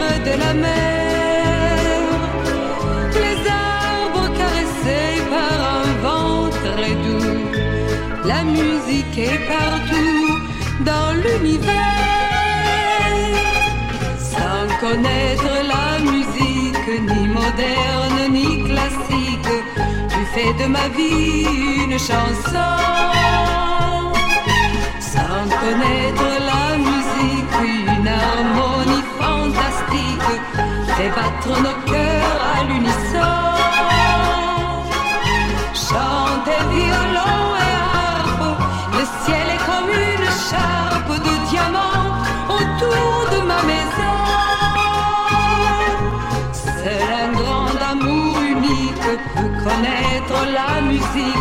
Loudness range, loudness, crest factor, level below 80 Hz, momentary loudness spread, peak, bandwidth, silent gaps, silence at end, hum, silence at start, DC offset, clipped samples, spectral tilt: 2 LU; -17 LUFS; 16 dB; -28 dBFS; 4 LU; -2 dBFS; 16.5 kHz; none; 0 s; none; 0 s; under 0.1%; under 0.1%; -5 dB/octave